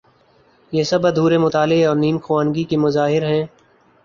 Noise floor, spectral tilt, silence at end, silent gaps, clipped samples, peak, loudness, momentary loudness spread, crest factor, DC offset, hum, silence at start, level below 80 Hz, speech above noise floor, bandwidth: -55 dBFS; -6.5 dB/octave; 0.6 s; none; under 0.1%; -4 dBFS; -17 LUFS; 6 LU; 14 dB; under 0.1%; none; 0.7 s; -56 dBFS; 38 dB; 7.2 kHz